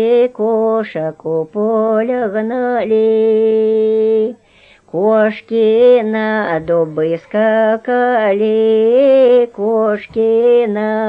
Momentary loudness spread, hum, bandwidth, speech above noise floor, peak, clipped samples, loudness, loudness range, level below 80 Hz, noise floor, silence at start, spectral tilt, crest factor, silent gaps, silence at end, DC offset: 7 LU; none; 4.9 kHz; 34 dB; 0 dBFS; under 0.1%; -13 LUFS; 3 LU; -56 dBFS; -47 dBFS; 0 s; -8 dB/octave; 12 dB; none; 0 s; under 0.1%